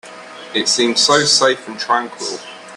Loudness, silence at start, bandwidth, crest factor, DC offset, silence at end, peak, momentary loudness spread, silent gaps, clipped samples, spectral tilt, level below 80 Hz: -15 LUFS; 0.05 s; 14 kHz; 18 dB; under 0.1%; 0 s; 0 dBFS; 17 LU; none; under 0.1%; -1.5 dB/octave; -64 dBFS